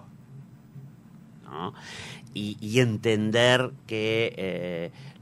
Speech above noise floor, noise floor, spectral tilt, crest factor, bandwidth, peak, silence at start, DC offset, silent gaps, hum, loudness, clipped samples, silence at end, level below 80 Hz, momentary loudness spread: 23 dB; -49 dBFS; -5 dB/octave; 24 dB; 14 kHz; -6 dBFS; 0.05 s; under 0.1%; none; none; -26 LUFS; under 0.1%; 0.1 s; -64 dBFS; 25 LU